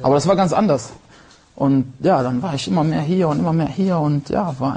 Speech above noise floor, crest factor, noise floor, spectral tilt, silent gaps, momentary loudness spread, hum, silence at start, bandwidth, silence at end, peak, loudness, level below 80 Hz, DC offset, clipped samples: 30 dB; 14 dB; -48 dBFS; -7 dB/octave; none; 6 LU; none; 0 s; 9.8 kHz; 0 s; -4 dBFS; -18 LUFS; -50 dBFS; under 0.1%; under 0.1%